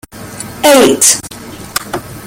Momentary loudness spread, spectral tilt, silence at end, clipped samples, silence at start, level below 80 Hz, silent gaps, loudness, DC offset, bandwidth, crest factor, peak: 21 LU; -2 dB/octave; 0 s; 0.2%; 0.15 s; -44 dBFS; none; -9 LUFS; under 0.1%; over 20 kHz; 12 dB; 0 dBFS